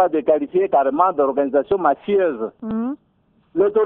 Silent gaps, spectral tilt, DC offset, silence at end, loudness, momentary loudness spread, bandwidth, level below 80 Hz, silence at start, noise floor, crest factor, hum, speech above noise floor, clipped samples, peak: none; -10.5 dB/octave; under 0.1%; 0 s; -19 LUFS; 10 LU; 3.9 kHz; -58 dBFS; 0 s; -60 dBFS; 16 dB; none; 42 dB; under 0.1%; -2 dBFS